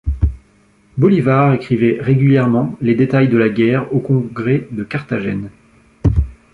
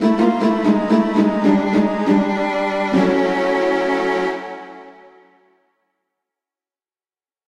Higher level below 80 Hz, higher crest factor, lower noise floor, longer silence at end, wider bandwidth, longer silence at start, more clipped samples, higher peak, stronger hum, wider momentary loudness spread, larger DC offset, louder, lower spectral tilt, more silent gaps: first, -28 dBFS vs -54 dBFS; about the same, 14 dB vs 16 dB; second, -52 dBFS vs under -90 dBFS; second, 0.2 s vs 2.55 s; second, 5 kHz vs 10 kHz; about the same, 0.05 s vs 0 s; neither; about the same, -2 dBFS vs -4 dBFS; neither; first, 10 LU vs 7 LU; neither; about the same, -15 LUFS vs -17 LUFS; first, -9.5 dB/octave vs -7 dB/octave; neither